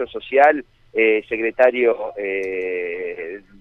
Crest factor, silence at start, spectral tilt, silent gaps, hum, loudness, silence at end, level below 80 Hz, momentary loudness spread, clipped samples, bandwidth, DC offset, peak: 18 dB; 0 s; -5.5 dB/octave; none; none; -19 LUFS; 0.2 s; -56 dBFS; 12 LU; under 0.1%; 6.2 kHz; under 0.1%; -2 dBFS